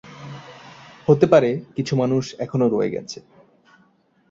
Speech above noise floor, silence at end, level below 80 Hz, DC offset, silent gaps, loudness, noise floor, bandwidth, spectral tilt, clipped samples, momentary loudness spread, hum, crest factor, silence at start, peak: 41 dB; 1.1 s; -60 dBFS; under 0.1%; none; -20 LUFS; -60 dBFS; 7.8 kHz; -7 dB/octave; under 0.1%; 23 LU; none; 20 dB; 0.05 s; -2 dBFS